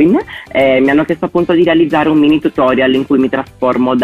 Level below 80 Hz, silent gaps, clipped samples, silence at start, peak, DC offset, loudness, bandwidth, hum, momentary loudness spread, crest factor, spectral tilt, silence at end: -44 dBFS; none; under 0.1%; 0 s; -2 dBFS; under 0.1%; -12 LUFS; 7.2 kHz; none; 6 LU; 10 dB; -7.5 dB/octave; 0 s